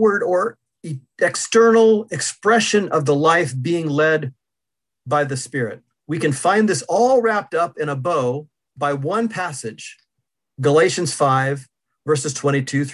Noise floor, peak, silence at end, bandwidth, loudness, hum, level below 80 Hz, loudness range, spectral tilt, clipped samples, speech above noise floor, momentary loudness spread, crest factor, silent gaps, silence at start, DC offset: -86 dBFS; -2 dBFS; 0 s; 12 kHz; -18 LUFS; none; -64 dBFS; 5 LU; -4.5 dB/octave; under 0.1%; 67 dB; 15 LU; 16 dB; none; 0 s; under 0.1%